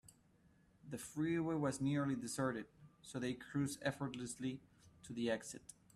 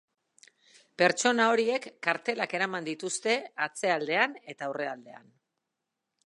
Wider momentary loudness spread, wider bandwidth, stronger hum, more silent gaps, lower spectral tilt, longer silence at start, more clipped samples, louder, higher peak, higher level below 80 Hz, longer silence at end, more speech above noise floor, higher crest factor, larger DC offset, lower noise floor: first, 14 LU vs 11 LU; first, 14 kHz vs 11.5 kHz; neither; neither; first, -5.5 dB/octave vs -2.5 dB/octave; second, 0.85 s vs 1 s; neither; second, -42 LUFS vs -28 LUFS; second, -24 dBFS vs -8 dBFS; first, -72 dBFS vs -84 dBFS; second, 0.25 s vs 1.05 s; second, 30 dB vs 56 dB; second, 18 dB vs 24 dB; neither; second, -71 dBFS vs -85 dBFS